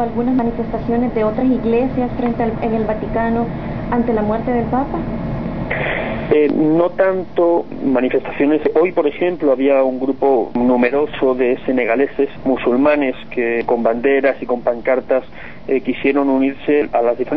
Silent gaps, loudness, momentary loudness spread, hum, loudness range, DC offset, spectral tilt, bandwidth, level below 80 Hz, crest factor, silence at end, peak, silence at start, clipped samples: none; -17 LUFS; 6 LU; none; 3 LU; 2%; -10 dB/octave; 5.6 kHz; -36 dBFS; 14 dB; 0 s; -2 dBFS; 0 s; under 0.1%